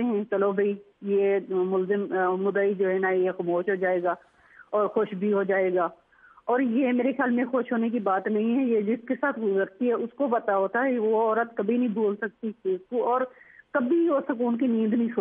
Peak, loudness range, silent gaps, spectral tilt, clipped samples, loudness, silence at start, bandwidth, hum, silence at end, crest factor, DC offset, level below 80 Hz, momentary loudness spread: -12 dBFS; 1 LU; none; -10.5 dB/octave; under 0.1%; -26 LUFS; 0 s; 3.7 kHz; none; 0 s; 14 dB; under 0.1%; -78 dBFS; 5 LU